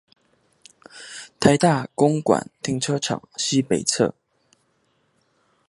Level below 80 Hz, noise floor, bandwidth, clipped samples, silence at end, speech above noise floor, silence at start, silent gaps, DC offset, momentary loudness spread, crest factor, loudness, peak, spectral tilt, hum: -56 dBFS; -67 dBFS; 11.5 kHz; under 0.1%; 1.55 s; 46 dB; 0.95 s; none; under 0.1%; 16 LU; 24 dB; -21 LUFS; 0 dBFS; -4.5 dB/octave; none